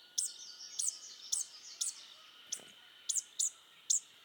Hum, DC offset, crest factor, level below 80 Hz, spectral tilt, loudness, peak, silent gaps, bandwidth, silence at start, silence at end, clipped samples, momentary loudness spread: none; under 0.1%; 24 dB; under -90 dBFS; 4 dB/octave; -37 LUFS; -18 dBFS; none; 19 kHz; 0 s; 0 s; under 0.1%; 18 LU